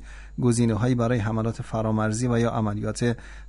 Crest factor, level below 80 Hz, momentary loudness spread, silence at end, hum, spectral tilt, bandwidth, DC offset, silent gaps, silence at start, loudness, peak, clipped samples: 14 dB; -42 dBFS; 6 LU; 0 s; none; -6.5 dB/octave; 11 kHz; under 0.1%; none; 0 s; -25 LUFS; -10 dBFS; under 0.1%